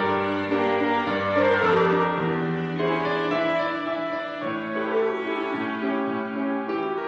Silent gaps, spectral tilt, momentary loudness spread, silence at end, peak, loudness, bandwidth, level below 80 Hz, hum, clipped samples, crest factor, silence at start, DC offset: none; -4 dB/octave; 8 LU; 0 s; -10 dBFS; -24 LUFS; 8 kHz; -66 dBFS; none; under 0.1%; 14 dB; 0 s; under 0.1%